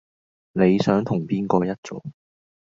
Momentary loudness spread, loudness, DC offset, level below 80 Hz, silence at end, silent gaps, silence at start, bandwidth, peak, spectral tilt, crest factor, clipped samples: 17 LU; -22 LUFS; under 0.1%; -56 dBFS; 0.5 s; 1.78-1.83 s; 0.55 s; 7.6 kHz; -4 dBFS; -7.5 dB/octave; 20 dB; under 0.1%